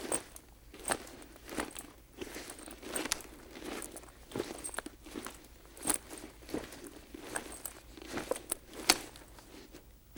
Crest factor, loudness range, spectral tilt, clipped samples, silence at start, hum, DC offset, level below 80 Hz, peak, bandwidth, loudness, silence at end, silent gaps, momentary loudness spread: 36 dB; 5 LU; -1.5 dB/octave; under 0.1%; 0 s; none; under 0.1%; -58 dBFS; -6 dBFS; over 20 kHz; -38 LUFS; 0 s; none; 19 LU